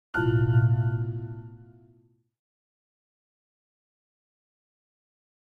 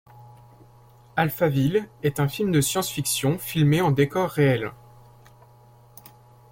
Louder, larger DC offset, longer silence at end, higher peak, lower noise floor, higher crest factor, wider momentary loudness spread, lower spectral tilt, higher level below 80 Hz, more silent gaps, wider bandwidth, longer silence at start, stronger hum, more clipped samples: about the same, -25 LUFS vs -23 LUFS; neither; first, 3.8 s vs 1.75 s; second, -12 dBFS vs -8 dBFS; first, -63 dBFS vs -52 dBFS; about the same, 18 dB vs 18 dB; first, 19 LU vs 6 LU; first, -10 dB/octave vs -5.5 dB/octave; about the same, -52 dBFS vs -56 dBFS; neither; second, 3.2 kHz vs 16.5 kHz; about the same, 0.15 s vs 0.15 s; neither; neither